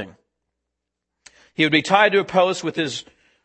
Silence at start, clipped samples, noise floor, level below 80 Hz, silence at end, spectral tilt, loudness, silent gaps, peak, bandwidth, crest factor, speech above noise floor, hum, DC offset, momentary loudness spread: 0 s; under 0.1%; -81 dBFS; -66 dBFS; 0.45 s; -4 dB/octave; -18 LUFS; none; 0 dBFS; 8.8 kHz; 22 dB; 62 dB; none; under 0.1%; 17 LU